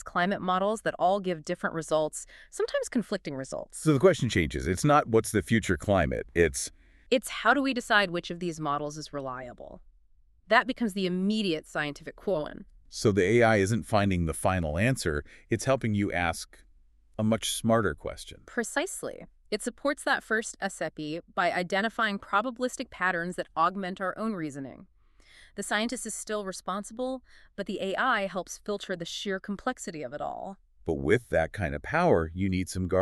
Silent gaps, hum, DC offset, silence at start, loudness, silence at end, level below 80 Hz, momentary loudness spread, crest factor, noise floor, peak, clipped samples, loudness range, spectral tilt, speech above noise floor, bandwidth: none; none; under 0.1%; 0 s; -29 LUFS; 0 s; -50 dBFS; 13 LU; 22 dB; -61 dBFS; -6 dBFS; under 0.1%; 6 LU; -5 dB/octave; 33 dB; 13.5 kHz